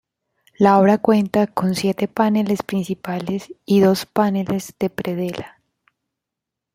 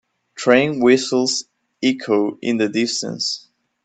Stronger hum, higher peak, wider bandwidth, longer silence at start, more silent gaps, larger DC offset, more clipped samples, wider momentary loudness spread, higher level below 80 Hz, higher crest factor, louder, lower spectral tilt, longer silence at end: neither; about the same, -2 dBFS vs 0 dBFS; first, 16 kHz vs 9.2 kHz; first, 0.6 s vs 0.35 s; neither; neither; neither; first, 11 LU vs 8 LU; first, -58 dBFS vs -64 dBFS; about the same, 18 dB vs 18 dB; about the same, -19 LUFS vs -19 LUFS; first, -6.5 dB/octave vs -3.5 dB/octave; first, 1.25 s vs 0.45 s